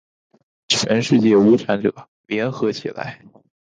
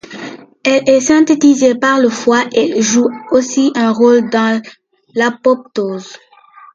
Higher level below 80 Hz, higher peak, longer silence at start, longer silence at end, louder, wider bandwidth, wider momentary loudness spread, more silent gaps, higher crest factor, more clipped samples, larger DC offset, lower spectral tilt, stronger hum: about the same, -60 dBFS vs -58 dBFS; second, -4 dBFS vs 0 dBFS; first, 0.7 s vs 0.1 s; second, 0.45 s vs 0.6 s; second, -18 LUFS vs -12 LUFS; about the same, 9.6 kHz vs 9 kHz; first, 15 LU vs 11 LU; first, 2.08-2.24 s vs none; about the same, 16 dB vs 12 dB; neither; neither; first, -5 dB/octave vs -3.5 dB/octave; neither